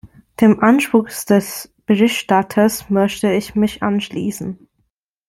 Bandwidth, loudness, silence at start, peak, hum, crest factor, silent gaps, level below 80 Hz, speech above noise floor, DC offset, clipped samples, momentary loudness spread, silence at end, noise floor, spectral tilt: 16.5 kHz; -16 LUFS; 0.05 s; -2 dBFS; none; 16 dB; none; -52 dBFS; 53 dB; under 0.1%; under 0.1%; 14 LU; 0.75 s; -68 dBFS; -5.5 dB/octave